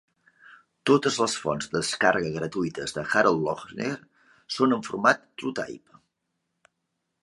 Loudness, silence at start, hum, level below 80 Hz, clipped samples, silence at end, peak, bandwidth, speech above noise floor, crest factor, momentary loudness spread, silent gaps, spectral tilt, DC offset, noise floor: -25 LUFS; 0.5 s; none; -62 dBFS; under 0.1%; 1.45 s; -4 dBFS; 11.5 kHz; 54 dB; 22 dB; 11 LU; none; -4 dB/octave; under 0.1%; -80 dBFS